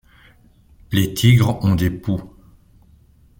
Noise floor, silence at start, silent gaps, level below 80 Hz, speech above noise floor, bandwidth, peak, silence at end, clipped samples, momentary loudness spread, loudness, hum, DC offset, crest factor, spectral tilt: -51 dBFS; 0.9 s; none; -42 dBFS; 35 dB; 17 kHz; -2 dBFS; 1.15 s; under 0.1%; 11 LU; -18 LUFS; none; under 0.1%; 18 dB; -6 dB/octave